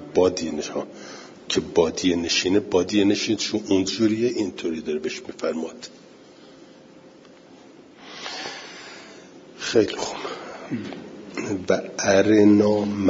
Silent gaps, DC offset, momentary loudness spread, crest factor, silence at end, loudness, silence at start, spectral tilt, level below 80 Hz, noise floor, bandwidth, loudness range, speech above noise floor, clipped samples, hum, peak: none; under 0.1%; 20 LU; 18 dB; 0 s; -23 LUFS; 0 s; -4.5 dB/octave; -60 dBFS; -48 dBFS; 7.8 kHz; 16 LU; 26 dB; under 0.1%; none; -6 dBFS